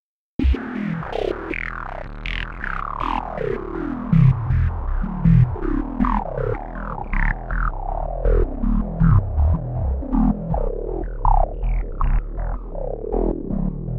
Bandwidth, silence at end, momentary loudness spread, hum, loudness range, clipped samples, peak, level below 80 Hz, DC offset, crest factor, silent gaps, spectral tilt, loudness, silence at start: 4.7 kHz; 0 s; 12 LU; none; 5 LU; under 0.1%; -4 dBFS; -24 dBFS; under 0.1%; 16 dB; none; -10 dB/octave; -23 LUFS; 0.4 s